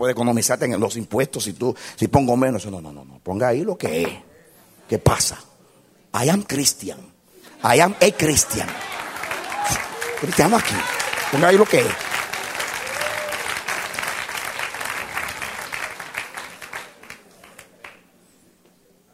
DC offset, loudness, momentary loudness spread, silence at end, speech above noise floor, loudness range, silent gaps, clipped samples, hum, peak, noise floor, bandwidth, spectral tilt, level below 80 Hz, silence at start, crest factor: under 0.1%; -21 LUFS; 17 LU; 1.2 s; 37 dB; 10 LU; none; under 0.1%; none; 0 dBFS; -57 dBFS; 16 kHz; -3.5 dB/octave; -48 dBFS; 0 s; 22 dB